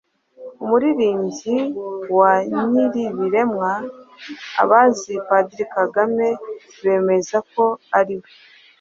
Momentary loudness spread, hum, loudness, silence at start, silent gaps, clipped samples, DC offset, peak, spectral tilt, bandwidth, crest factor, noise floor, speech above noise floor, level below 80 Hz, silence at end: 13 LU; none; -19 LUFS; 0.4 s; none; under 0.1%; under 0.1%; -2 dBFS; -5.5 dB/octave; 7.8 kHz; 18 dB; -40 dBFS; 21 dB; -66 dBFS; 0.6 s